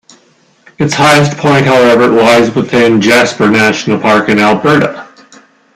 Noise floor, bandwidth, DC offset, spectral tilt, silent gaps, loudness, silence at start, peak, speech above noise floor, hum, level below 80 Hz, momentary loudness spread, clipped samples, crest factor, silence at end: -48 dBFS; 16 kHz; under 0.1%; -5 dB/octave; none; -8 LUFS; 0.8 s; 0 dBFS; 41 dB; none; -46 dBFS; 5 LU; under 0.1%; 8 dB; 0.7 s